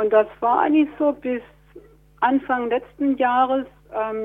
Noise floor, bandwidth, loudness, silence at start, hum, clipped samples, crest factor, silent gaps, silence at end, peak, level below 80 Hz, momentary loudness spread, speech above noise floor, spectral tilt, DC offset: -47 dBFS; 3.9 kHz; -21 LUFS; 0 s; none; under 0.1%; 16 dB; none; 0 s; -4 dBFS; -56 dBFS; 10 LU; 27 dB; -7.5 dB/octave; under 0.1%